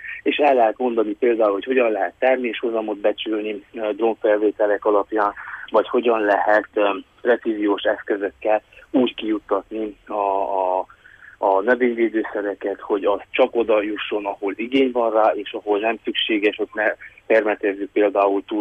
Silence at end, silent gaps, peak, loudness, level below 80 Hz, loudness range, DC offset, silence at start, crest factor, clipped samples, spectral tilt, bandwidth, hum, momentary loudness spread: 0 s; none; -6 dBFS; -21 LUFS; -60 dBFS; 3 LU; under 0.1%; 0 s; 14 dB; under 0.1%; -6 dB/octave; 5.8 kHz; none; 7 LU